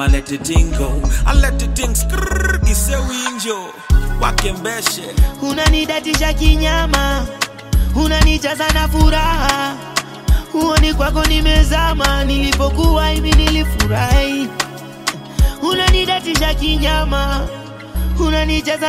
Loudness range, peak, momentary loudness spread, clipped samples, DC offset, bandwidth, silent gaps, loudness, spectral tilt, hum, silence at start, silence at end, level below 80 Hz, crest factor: 3 LU; 0 dBFS; 8 LU; under 0.1%; under 0.1%; 16 kHz; none; -16 LUFS; -4.5 dB/octave; none; 0 s; 0 s; -16 dBFS; 14 dB